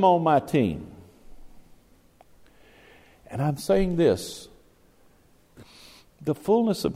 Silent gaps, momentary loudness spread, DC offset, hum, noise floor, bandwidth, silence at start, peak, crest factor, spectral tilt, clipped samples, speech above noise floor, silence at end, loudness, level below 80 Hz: none; 17 LU; under 0.1%; none; -58 dBFS; 16 kHz; 0 s; -8 dBFS; 18 dB; -6.5 dB/octave; under 0.1%; 36 dB; 0 s; -24 LUFS; -48 dBFS